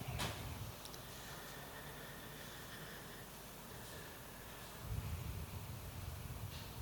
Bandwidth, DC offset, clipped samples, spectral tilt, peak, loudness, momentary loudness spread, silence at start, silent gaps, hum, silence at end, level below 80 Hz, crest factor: 19 kHz; under 0.1%; under 0.1%; -4 dB/octave; -28 dBFS; -49 LUFS; 6 LU; 0 s; none; none; 0 s; -56 dBFS; 20 dB